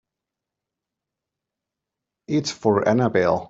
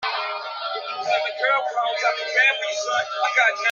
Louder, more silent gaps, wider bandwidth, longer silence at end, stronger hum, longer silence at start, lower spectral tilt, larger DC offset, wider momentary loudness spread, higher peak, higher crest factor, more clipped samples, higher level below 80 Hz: about the same, -21 LUFS vs -21 LUFS; neither; about the same, 8 kHz vs 7.6 kHz; about the same, 0.05 s vs 0 s; neither; first, 2.3 s vs 0 s; first, -6 dB/octave vs 1 dB/octave; neither; second, 6 LU vs 10 LU; about the same, -4 dBFS vs -6 dBFS; about the same, 20 dB vs 18 dB; neither; first, -62 dBFS vs -78 dBFS